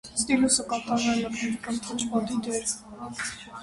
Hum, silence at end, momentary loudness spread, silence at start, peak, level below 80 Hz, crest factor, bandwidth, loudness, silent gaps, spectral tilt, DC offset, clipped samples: none; 0 s; 11 LU; 0.05 s; -8 dBFS; -56 dBFS; 20 dB; 11.5 kHz; -27 LUFS; none; -2.5 dB/octave; under 0.1%; under 0.1%